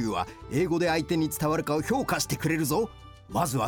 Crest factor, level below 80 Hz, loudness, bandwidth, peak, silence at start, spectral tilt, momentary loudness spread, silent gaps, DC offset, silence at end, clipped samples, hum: 14 dB; -50 dBFS; -28 LUFS; 19 kHz; -14 dBFS; 0 s; -5 dB/octave; 6 LU; none; under 0.1%; 0 s; under 0.1%; none